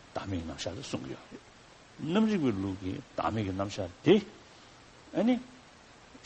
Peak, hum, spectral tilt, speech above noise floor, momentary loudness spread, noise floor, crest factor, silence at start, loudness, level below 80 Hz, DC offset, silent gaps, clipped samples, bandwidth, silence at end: -10 dBFS; none; -6.5 dB/octave; 24 dB; 20 LU; -55 dBFS; 22 dB; 0.15 s; -31 LUFS; -60 dBFS; under 0.1%; none; under 0.1%; 8.4 kHz; 0.1 s